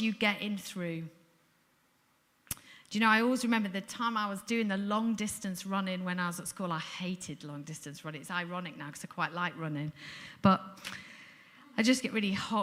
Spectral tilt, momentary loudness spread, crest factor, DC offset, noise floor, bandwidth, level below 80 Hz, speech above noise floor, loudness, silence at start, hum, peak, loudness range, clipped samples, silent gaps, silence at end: -4.5 dB/octave; 15 LU; 22 dB; under 0.1%; -71 dBFS; 16 kHz; -70 dBFS; 38 dB; -33 LUFS; 0 s; none; -12 dBFS; 7 LU; under 0.1%; none; 0 s